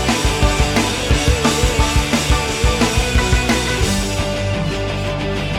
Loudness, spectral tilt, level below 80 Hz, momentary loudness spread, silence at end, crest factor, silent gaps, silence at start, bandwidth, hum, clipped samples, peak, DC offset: -17 LUFS; -4 dB/octave; -22 dBFS; 5 LU; 0 s; 14 dB; none; 0 s; 16.5 kHz; none; under 0.1%; -2 dBFS; under 0.1%